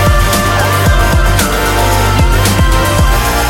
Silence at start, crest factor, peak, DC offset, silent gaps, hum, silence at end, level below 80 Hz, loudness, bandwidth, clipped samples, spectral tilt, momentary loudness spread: 0 s; 10 dB; 0 dBFS; under 0.1%; none; none; 0 s; -14 dBFS; -10 LUFS; 17 kHz; under 0.1%; -4.5 dB/octave; 1 LU